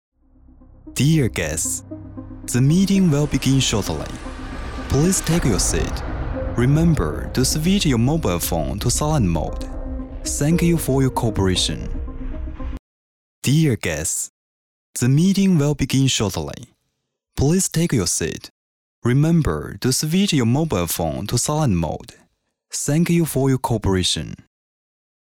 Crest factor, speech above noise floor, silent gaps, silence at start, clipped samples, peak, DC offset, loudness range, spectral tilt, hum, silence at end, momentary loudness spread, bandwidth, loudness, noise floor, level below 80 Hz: 14 dB; 56 dB; 12.79-13.42 s, 14.29-14.94 s, 18.50-19.02 s; 0.85 s; under 0.1%; -6 dBFS; under 0.1%; 3 LU; -5 dB/octave; none; 0.9 s; 15 LU; 19 kHz; -19 LUFS; -75 dBFS; -32 dBFS